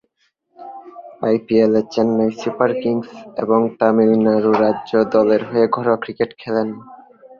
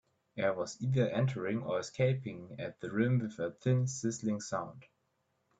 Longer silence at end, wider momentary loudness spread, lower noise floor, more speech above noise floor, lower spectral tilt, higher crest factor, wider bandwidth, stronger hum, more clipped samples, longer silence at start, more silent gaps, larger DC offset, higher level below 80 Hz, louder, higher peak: second, 0.45 s vs 0.75 s; about the same, 12 LU vs 11 LU; second, -66 dBFS vs -79 dBFS; first, 49 dB vs 45 dB; about the same, -7.5 dB/octave vs -6.5 dB/octave; about the same, 16 dB vs 18 dB; second, 7 kHz vs 8 kHz; neither; neither; first, 0.6 s vs 0.35 s; neither; neither; first, -60 dBFS vs -70 dBFS; first, -17 LUFS vs -34 LUFS; first, -2 dBFS vs -18 dBFS